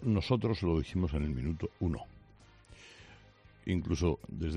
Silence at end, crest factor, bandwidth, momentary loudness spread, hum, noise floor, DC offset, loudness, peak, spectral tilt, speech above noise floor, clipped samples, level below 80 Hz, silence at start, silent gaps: 0 s; 20 dB; 10 kHz; 22 LU; none; -59 dBFS; under 0.1%; -34 LUFS; -14 dBFS; -7.5 dB/octave; 27 dB; under 0.1%; -46 dBFS; 0 s; none